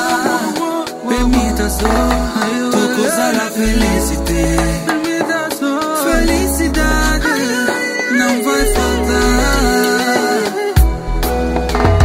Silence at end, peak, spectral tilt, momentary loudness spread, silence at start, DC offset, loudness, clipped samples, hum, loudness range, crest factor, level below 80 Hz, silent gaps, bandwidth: 0 s; 0 dBFS; -4.5 dB/octave; 4 LU; 0 s; under 0.1%; -15 LUFS; under 0.1%; none; 1 LU; 14 dB; -20 dBFS; none; 16.5 kHz